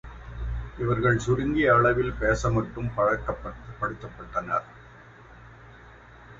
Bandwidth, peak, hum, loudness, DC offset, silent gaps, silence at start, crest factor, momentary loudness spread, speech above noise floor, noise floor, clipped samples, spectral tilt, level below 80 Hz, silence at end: 8 kHz; -8 dBFS; none; -26 LUFS; under 0.1%; none; 0.05 s; 18 dB; 15 LU; 24 dB; -49 dBFS; under 0.1%; -7 dB/octave; -40 dBFS; 0 s